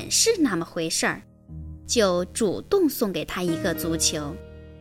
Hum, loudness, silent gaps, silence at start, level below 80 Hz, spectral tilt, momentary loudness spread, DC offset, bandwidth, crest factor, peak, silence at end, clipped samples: none; -24 LUFS; none; 0 s; -46 dBFS; -3 dB/octave; 19 LU; under 0.1%; 17 kHz; 18 dB; -8 dBFS; 0 s; under 0.1%